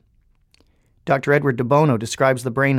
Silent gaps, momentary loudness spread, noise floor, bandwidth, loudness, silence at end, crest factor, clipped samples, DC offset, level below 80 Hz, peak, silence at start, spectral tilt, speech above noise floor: none; 5 LU; -59 dBFS; 14.5 kHz; -18 LUFS; 0 s; 18 dB; under 0.1%; under 0.1%; -56 dBFS; -2 dBFS; 1.05 s; -6.5 dB/octave; 41 dB